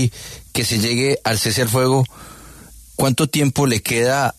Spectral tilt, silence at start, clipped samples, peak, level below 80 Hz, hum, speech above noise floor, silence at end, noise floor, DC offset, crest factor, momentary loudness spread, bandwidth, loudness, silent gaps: -4.5 dB/octave; 0 s; under 0.1%; -4 dBFS; -46 dBFS; none; 24 dB; 0.05 s; -41 dBFS; under 0.1%; 14 dB; 12 LU; 14 kHz; -18 LUFS; none